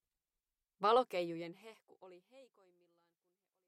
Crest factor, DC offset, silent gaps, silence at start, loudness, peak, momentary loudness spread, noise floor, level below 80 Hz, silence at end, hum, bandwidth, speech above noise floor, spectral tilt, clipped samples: 22 dB; under 0.1%; none; 0.8 s; -35 LUFS; -18 dBFS; 18 LU; under -90 dBFS; -86 dBFS; 1.25 s; none; 15 kHz; over 52 dB; -5.5 dB/octave; under 0.1%